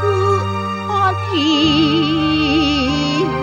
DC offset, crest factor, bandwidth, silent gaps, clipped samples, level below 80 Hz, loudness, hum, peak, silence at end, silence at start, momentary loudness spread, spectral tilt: 0.1%; 12 dB; 9 kHz; none; under 0.1%; -36 dBFS; -16 LUFS; none; -2 dBFS; 0 s; 0 s; 5 LU; -5.5 dB/octave